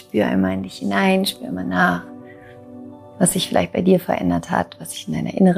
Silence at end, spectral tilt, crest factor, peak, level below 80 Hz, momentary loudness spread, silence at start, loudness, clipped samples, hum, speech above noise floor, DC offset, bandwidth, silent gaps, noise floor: 0 s; -5 dB/octave; 18 dB; -2 dBFS; -52 dBFS; 21 LU; 0.15 s; -20 LUFS; under 0.1%; none; 22 dB; under 0.1%; 15.5 kHz; none; -41 dBFS